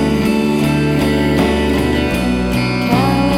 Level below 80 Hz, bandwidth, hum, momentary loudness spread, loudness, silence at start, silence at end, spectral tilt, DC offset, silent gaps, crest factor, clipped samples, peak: -26 dBFS; 17 kHz; none; 2 LU; -15 LUFS; 0 s; 0 s; -6.5 dB/octave; under 0.1%; none; 12 dB; under 0.1%; -2 dBFS